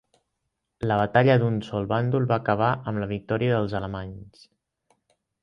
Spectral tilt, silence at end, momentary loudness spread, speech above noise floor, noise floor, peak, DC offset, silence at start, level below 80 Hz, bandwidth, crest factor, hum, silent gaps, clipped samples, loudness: -9 dB/octave; 1.15 s; 13 LU; 56 dB; -80 dBFS; -6 dBFS; under 0.1%; 0.8 s; -52 dBFS; 6.6 kHz; 20 dB; none; none; under 0.1%; -24 LUFS